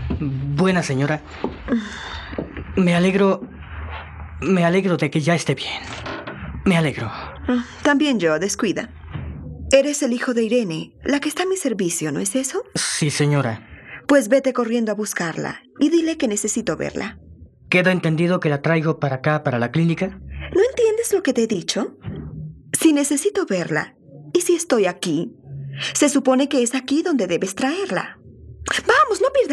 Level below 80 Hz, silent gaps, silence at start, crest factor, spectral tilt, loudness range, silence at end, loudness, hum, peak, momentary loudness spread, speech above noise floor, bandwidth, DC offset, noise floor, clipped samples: -44 dBFS; none; 0 s; 20 dB; -5 dB/octave; 2 LU; 0 s; -20 LUFS; none; 0 dBFS; 14 LU; 20 dB; 14 kHz; under 0.1%; -39 dBFS; under 0.1%